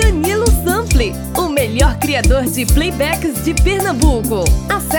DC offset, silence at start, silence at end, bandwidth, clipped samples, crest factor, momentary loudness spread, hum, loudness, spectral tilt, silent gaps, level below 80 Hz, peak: under 0.1%; 0 s; 0 s; over 20 kHz; under 0.1%; 14 dB; 3 LU; none; -15 LUFS; -5 dB/octave; none; -18 dBFS; 0 dBFS